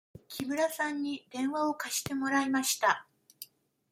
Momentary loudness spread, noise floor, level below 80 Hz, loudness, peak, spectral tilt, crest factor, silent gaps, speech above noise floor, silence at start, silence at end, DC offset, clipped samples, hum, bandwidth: 19 LU; -53 dBFS; -72 dBFS; -31 LUFS; -12 dBFS; -2.5 dB/octave; 20 dB; none; 22 dB; 0.3 s; 0.45 s; under 0.1%; under 0.1%; none; 16.5 kHz